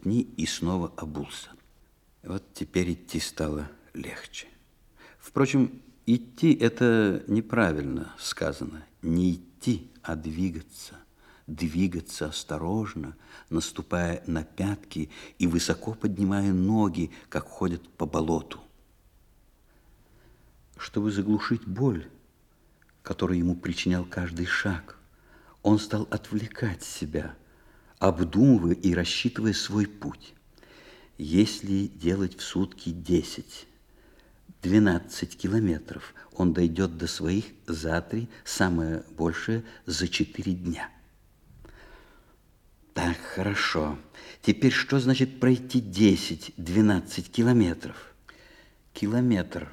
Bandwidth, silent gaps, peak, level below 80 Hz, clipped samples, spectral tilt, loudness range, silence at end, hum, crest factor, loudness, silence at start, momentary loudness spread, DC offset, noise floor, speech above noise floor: 15.5 kHz; none; -6 dBFS; -52 dBFS; under 0.1%; -5.5 dB/octave; 8 LU; 0 s; none; 22 dB; -27 LUFS; 0.05 s; 16 LU; under 0.1%; -62 dBFS; 35 dB